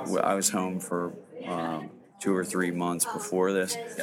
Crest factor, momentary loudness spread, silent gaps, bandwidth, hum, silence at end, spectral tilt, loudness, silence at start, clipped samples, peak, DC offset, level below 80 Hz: 20 dB; 10 LU; none; 17.5 kHz; none; 0 s; -4 dB/octave; -29 LUFS; 0 s; under 0.1%; -10 dBFS; under 0.1%; -76 dBFS